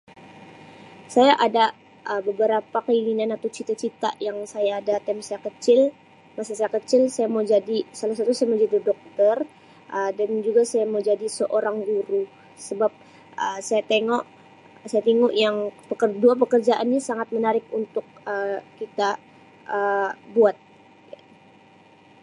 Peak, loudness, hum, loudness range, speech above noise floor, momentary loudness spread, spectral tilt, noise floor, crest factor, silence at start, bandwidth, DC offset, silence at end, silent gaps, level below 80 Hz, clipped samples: -4 dBFS; -23 LUFS; none; 4 LU; 30 dB; 12 LU; -4 dB/octave; -52 dBFS; 20 dB; 0.2 s; 11.5 kHz; under 0.1%; 1.7 s; none; -78 dBFS; under 0.1%